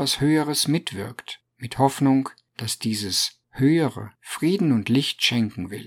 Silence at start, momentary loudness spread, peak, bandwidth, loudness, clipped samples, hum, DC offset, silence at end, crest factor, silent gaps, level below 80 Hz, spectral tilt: 0 s; 14 LU; -4 dBFS; 17.5 kHz; -22 LUFS; under 0.1%; none; under 0.1%; 0 s; 18 dB; none; -58 dBFS; -4.5 dB/octave